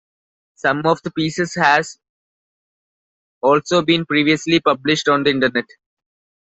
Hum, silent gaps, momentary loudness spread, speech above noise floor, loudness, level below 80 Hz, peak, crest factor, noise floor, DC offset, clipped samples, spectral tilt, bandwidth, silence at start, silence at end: none; 2.09-3.41 s; 6 LU; over 73 dB; -17 LUFS; -58 dBFS; -2 dBFS; 18 dB; under -90 dBFS; under 0.1%; under 0.1%; -4.5 dB/octave; 8.2 kHz; 0.65 s; 0.95 s